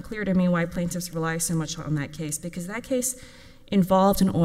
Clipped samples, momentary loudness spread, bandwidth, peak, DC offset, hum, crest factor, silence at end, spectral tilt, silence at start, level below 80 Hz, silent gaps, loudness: under 0.1%; 11 LU; 16 kHz; -8 dBFS; under 0.1%; none; 18 dB; 0 s; -5.5 dB/octave; 0 s; -46 dBFS; none; -25 LUFS